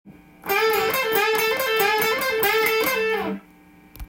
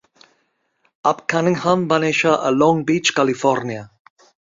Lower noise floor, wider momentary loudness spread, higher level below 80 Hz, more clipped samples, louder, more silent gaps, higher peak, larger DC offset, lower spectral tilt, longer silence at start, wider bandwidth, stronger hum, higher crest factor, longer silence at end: second, -50 dBFS vs -67 dBFS; about the same, 7 LU vs 6 LU; first, -52 dBFS vs -60 dBFS; neither; about the same, -20 LUFS vs -18 LUFS; neither; second, -8 dBFS vs -2 dBFS; neither; second, -2 dB/octave vs -5 dB/octave; second, 0.05 s vs 1.05 s; first, 17 kHz vs 7.8 kHz; neither; about the same, 16 dB vs 18 dB; second, 0.05 s vs 0.65 s